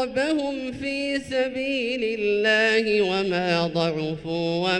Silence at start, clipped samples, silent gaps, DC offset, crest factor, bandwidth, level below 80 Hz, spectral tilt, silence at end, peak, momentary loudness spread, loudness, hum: 0 s; under 0.1%; none; under 0.1%; 14 dB; 11.5 kHz; -54 dBFS; -5 dB/octave; 0 s; -8 dBFS; 9 LU; -23 LUFS; none